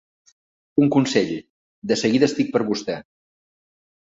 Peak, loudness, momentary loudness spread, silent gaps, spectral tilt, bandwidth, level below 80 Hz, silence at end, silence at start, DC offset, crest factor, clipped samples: -4 dBFS; -21 LUFS; 14 LU; 1.50-1.82 s; -5.5 dB/octave; 7.8 kHz; -62 dBFS; 1.15 s; 0.75 s; under 0.1%; 20 dB; under 0.1%